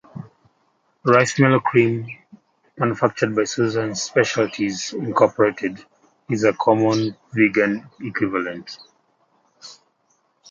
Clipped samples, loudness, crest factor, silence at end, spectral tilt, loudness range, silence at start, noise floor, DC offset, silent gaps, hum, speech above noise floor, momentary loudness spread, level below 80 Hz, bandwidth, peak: under 0.1%; -20 LUFS; 20 dB; 0.8 s; -5.5 dB/octave; 3 LU; 0.15 s; -65 dBFS; under 0.1%; none; none; 46 dB; 15 LU; -62 dBFS; 9.2 kHz; -2 dBFS